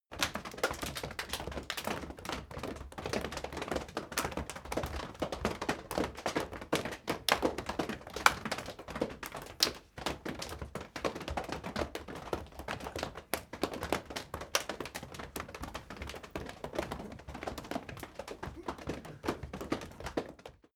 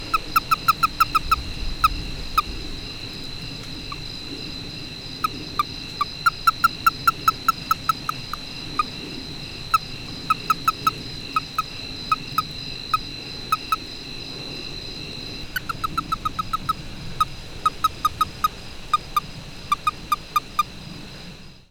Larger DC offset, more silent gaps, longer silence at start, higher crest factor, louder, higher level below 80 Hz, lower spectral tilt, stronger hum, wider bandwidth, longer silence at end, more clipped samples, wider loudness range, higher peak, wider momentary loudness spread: neither; neither; about the same, 0.1 s vs 0 s; first, 36 dB vs 22 dB; second, -38 LUFS vs -25 LUFS; second, -52 dBFS vs -38 dBFS; about the same, -3.5 dB/octave vs -3 dB/octave; neither; about the same, over 20 kHz vs 19.5 kHz; about the same, 0.2 s vs 0.1 s; neither; about the same, 8 LU vs 6 LU; about the same, -2 dBFS vs -4 dBFS; about the same, 12 LU vs 13 LU